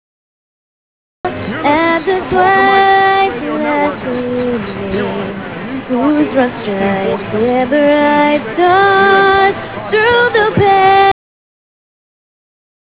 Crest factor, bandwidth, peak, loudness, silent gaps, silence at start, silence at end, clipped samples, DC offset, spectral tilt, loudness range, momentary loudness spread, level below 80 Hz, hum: 12 dB; 4 kHz; 0 dBFS; -12 LUFS; none; 1.25 s; 1.75 s; under 0.1%; 0.5%; -9 dB/octave; 6 LU; 11 LU; -42 dBFS; none